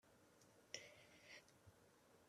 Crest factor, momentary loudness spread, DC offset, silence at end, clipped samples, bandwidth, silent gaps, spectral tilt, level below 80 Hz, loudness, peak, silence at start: 32 dB; 8 LU; under 0.1%; 0 s; under 0.1%; 13.5 kHz; none; -1.5 dB/octave; under -90 dBFS; -60 LUFS; -34 dBFS; 0.05 s